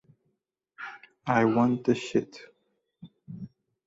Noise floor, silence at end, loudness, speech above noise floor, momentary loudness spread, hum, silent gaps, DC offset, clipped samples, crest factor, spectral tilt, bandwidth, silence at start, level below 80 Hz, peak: -79 dBFS; 0.4 s; -26 LUFS; 54 dB; 22 LU; none; none; under 0.1%; under 0.1%; 22 dB; -6.5 dB/octave; 7.8 kHz; 0.8 s; -68 dBFS; -8 dBFS